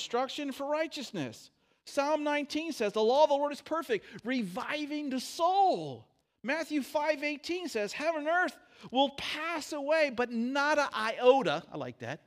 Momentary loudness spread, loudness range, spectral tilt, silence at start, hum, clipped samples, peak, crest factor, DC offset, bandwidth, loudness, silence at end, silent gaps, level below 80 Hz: 10 LU; 3 LU; -4 dB/octave; 0 s; none; under 0.1%; -10 dBFS; 22 dB; under 0.1%; 15.5 kHz; -31 LUFS; 0.1 s; none; -76 dBFS